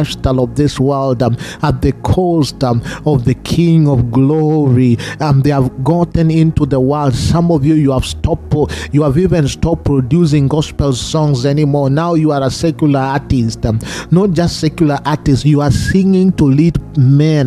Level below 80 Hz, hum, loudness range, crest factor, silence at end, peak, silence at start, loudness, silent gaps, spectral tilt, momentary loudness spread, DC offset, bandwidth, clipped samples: -30 dBFS; none; 2 LU; 12 dB; 0 s; 0 dBFS; 0 s; -13 LUFS; none; -7 dB/octave; 5 LU; under 0.1%; 13 kHz; under 0.1%